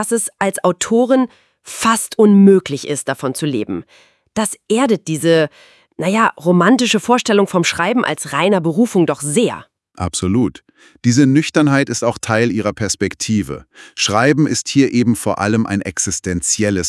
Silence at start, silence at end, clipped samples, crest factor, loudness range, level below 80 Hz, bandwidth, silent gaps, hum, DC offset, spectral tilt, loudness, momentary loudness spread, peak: 0 s; 0 s; under 0.1%; 16 dB; 3 LU; -52 dBFS; 12 kHz; none; none; under 0.1%; -4.5 dB/octave; -15 LUFS; 9 LU; 0 dBFS